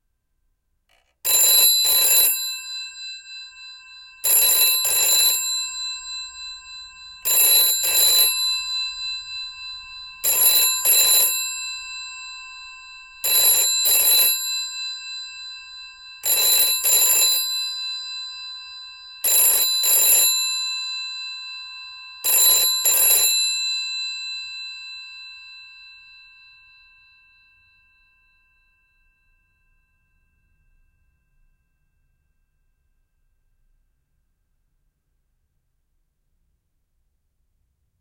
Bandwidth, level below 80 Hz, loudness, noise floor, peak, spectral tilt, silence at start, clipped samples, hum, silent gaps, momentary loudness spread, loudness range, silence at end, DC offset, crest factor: 17.5 kHz; -62 dBFS; -16 LUFS; -70 dBFS; -4 dBFS; 3.5 dB/octave; 1.25 s; under 0.1%; none; none; 22 LU; 1 LU; 12.1 s; under 0.1%; 20 dB